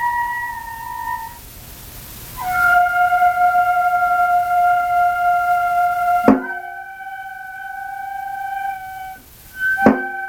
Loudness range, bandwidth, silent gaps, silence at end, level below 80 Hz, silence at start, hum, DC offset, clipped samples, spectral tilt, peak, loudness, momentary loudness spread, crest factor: 7 LU; over 20 kHz; none; 0 s; -46 dBFS; 0 s; none; under 0.1%; under 0.1%; -5 dB/octave; 0 dBFS; -17 LUFS; 19 LU; 18 dB